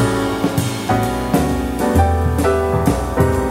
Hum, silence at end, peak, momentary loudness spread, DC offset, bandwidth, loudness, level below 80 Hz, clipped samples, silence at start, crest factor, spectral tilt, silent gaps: none; 0 s; -2 dBFS; 3 LU; under 0.1%; 16 kHz; -17 LUFS; -26 dBFS; under 0.1%; 0 s; 14 dB; -6.5 dB/octave; none